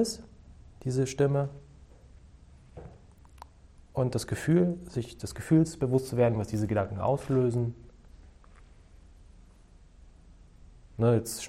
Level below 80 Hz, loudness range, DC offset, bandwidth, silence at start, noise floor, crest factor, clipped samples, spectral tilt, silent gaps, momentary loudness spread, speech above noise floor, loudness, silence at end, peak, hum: -52 dBFS; 7 LU; under 0.1%; 15.5 kHz; 0 s; -55 dBFS; 18 dB; under 0.1%; -7 dB/octave; none; 21 LU; 28 dB; -29 LUFS; 0 s; -12 dBFS; none